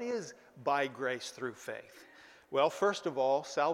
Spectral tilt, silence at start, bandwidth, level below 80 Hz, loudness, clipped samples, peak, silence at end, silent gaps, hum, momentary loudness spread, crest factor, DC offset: -4 dB/octave; 0 s; 15.5 kHz; -82 dBFS; -34 LUFS; under 0.1%; -16 dBFS; 0 s; none; none; 14 LU; 18 dB; under 0.1%